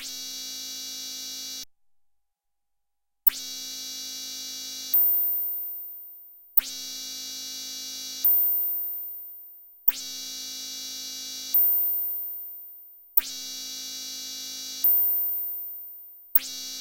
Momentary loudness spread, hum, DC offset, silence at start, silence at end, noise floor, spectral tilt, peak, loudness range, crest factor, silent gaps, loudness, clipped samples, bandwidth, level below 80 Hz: 18 LU; none; under 0.1%; 0 s; 0 s; -87 dBFS; 2 dB/octave; -4 dBFS; 5 LU; 24 dB; none; -25 LUFS; under 0.1%; 16.5 kHz; -68 dBFS